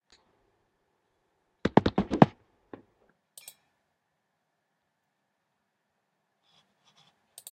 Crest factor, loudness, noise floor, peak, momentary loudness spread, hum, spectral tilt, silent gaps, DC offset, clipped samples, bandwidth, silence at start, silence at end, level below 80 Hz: 32 dB; -26 LUFS; -79 dBFS; 0 dBFS; 25 LU; none; -7 dB/octave; none; under 0.1%; under 0.1%; 13 kHz; 1.65 s; 5.25 s; -56 dBFS